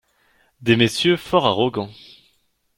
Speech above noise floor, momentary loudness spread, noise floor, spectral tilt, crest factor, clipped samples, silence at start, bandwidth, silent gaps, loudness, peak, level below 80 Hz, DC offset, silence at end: 46 dB; 12 LU; -65 dBFS; -5 dB/octave; 20 dB; under 0.1%; 0.6 s; 16.5 kHz; none; -19 LUFS; -2 dBFS; -56 dBFS; under 0.1%; 0.85 s